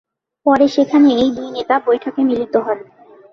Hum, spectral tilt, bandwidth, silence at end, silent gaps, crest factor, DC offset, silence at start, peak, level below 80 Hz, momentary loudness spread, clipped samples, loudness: none; -5.5 dB/octave; 6.6 kHz; 0.5 s; none; 14 dB; under 0.1%; 0.45 s; -2 dBFS; -54 dBFS; 10 LU; under 0.1%; -15 LUFS